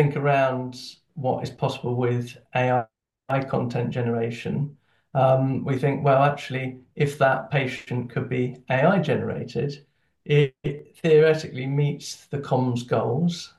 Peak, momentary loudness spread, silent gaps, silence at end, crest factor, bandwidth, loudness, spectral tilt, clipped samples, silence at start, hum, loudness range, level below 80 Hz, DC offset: -6 dBFS; 12 LU; none; 0.1 s; 18 dB; 12 kHz; -24 LUFS; -7 dB/octave; under 0.1%; 0 s; none; 3 LU; -62 dBFS; under 0.1%